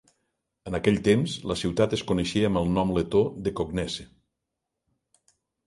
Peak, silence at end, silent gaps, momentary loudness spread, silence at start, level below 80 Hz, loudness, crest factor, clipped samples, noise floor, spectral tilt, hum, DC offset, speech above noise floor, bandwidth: -6 dBFS; 1.6 s; none; 9 LU; 0.65 s; -48 dBFS; -26 LUFS; 20 dB; under 0.1%; -84 dBFS; -6 dB/octave; none; under 0.1%; 59 dB; 11.5 kHz